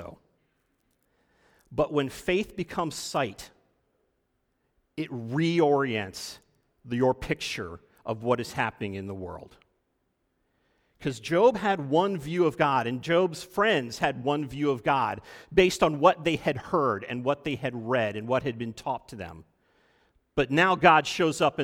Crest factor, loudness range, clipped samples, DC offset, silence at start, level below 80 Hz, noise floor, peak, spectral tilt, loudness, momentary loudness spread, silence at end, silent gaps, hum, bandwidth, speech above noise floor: 24 dB; 7 LU; under 0.1%; under 0.1%; 0 s; -56 dBFS; -75 dBFS; -4 dBFS; -5.5 dB/octave; -27 LUFS; 14 LU; 0 s; none; none; 17.5 kHz; 49 dB